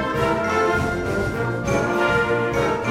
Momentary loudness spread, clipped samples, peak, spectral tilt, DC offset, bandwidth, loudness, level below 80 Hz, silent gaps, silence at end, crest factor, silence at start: 4 LU; under 0.1%; -8 dBFS; -6 dB/octave; under 0.1%; 16 kHz; -21 LUFS; -38 dBFS; none; 0 s; 14 dB; 0 s